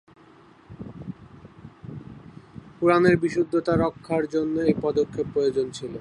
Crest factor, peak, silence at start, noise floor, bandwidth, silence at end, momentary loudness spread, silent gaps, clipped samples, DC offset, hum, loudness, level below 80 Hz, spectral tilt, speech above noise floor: 22 dB; -4 dBFS; 0.7 s; -52 dBFS; 10.5 kHz; 0 s; 24 LU; none; under 0.1%; under 0.1%; none; -23 LUFS; -54 dBFS; -7 dB/octave; 30 dB